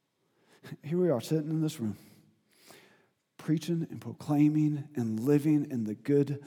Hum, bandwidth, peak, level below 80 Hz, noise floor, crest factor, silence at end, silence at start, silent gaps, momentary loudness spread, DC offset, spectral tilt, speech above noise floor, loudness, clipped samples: none; 16.5 kHz; -14 dBFS; -84 dBFS; -72 dBFS; 16 dB; 0 s; 0.65 s; none; 14 LU; under 0.1%; -8 dB/octave; 43 dB; -30 LUFS; under 0.1%